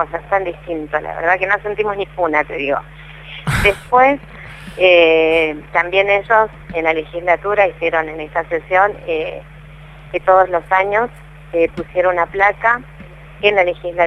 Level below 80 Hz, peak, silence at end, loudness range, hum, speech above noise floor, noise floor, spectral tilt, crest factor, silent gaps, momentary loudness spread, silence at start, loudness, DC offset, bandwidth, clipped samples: -40 dBFS; 0 dBFS; 0 s; 4 LU; none; 21 dB; -37 dBFS; -5.5 dB/octave; 16 dB; none; 11 LU; 0 s; -16 LUFS; under 0.1%; 13 kHz; under 0.1%